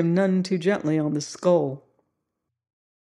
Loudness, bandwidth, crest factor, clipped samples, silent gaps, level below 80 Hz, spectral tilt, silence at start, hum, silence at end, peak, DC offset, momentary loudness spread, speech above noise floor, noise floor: -23 LUFS; 11 kHz; 18 dB; under 0.1%; none; -74 dBFS; -6.5 dB/octave; 0 s; none; 1.35 s; -8 dBFS; under 0.1%; 7 LU; 58 dB; -81 dBFS